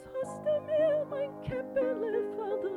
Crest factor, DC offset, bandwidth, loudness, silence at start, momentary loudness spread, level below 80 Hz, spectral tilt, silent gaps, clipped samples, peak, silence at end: 12 dB; under 0.1%; 11 kHz; -32 LUFS; 0 s; 8 LU; -62 dBFS; -7 dB/octave; none; under 0.1%; -20 dBFS; 0 s